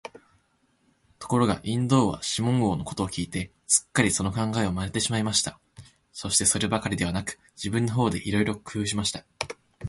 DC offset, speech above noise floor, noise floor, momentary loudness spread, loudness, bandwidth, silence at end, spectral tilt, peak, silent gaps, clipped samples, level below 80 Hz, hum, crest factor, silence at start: under 0.1%; 42 dB; -68 dBFS; 13 LU; -26 LUFS; 12 kHz; 0 s; -4 dB/octave; -6 dBFS; none; under 0.1%; -48 dBFS; none; 20 dB; 1.2 s